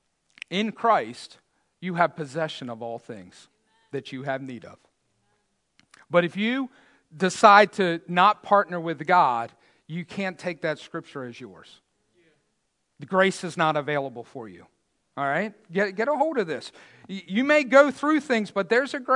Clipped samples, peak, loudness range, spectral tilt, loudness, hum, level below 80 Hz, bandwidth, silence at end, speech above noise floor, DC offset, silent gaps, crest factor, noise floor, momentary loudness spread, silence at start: under 0.1%; 0 dBFS; 14 LU; -5 dB/octave; -23 LUFS; none; -80 dBFS; 11 kHz; 0 s; 51 dB; under 0.1%; none; 24 dB; -75 dBFS; 21 LU; 0.5 s